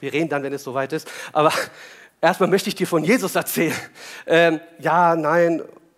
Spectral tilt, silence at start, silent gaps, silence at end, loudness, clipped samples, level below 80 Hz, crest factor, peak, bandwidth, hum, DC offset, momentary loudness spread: -4.5 dB/octave; 0 s; none; 0.3 s; -20 LUFS; under 0.1%; -74 dBFS; 18 dB; -4 dBFS; 16 kHz; none; under 0.1%; 11 LU